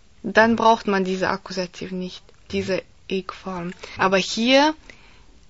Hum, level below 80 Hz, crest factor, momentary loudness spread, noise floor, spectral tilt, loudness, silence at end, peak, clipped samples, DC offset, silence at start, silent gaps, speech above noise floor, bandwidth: none; -52 dBFS; 20 dB; 15 LU; -51 dBFS; -4.5 dB/octave; -21 LUFS; 0.75 s; -2 dBFS; under 0.1%; 0.3%; 0.25 s; none; 29 dB; 8 kHz